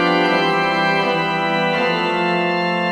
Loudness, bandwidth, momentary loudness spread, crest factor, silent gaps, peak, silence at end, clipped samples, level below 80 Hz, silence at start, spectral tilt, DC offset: -17 LUFS; 15.5 kHz; 3 LU; 12 dB; none; -4 dBFS; 0 s; under 0.1%; -60 dBFS; 0 s; -5.5 dB/octave; under 0.1%